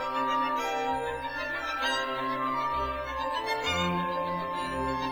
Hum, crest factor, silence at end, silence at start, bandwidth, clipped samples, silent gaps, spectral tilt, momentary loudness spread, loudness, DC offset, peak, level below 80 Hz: none; 14 dB; 0 s; 0 s; over 20 kHz; under 0.1%; none; -4 dB/octave; 4 LU; -30 LUFS; under 0.1%; -16 dBFS; -50 dBFS